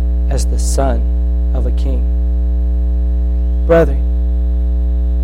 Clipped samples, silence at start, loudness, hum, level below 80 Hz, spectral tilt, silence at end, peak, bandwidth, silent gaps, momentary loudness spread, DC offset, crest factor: under 0.1%; 0 s; -16 LUFS; none; -14 dBFS; -7 dB/octave; 0 s; 0 dBFS; 11.5 kHz; none; 5 LU; under 0.1%; 12 dB